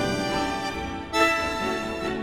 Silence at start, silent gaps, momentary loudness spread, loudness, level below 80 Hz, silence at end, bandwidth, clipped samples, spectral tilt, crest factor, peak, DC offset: 0 s; none; 8 LU; -25 LUFS; -44 dBFS; 0 s; 18.5 kHz; under 0.1%; -4 dB/octave; 20 dB; -6 dBFS; 0.1%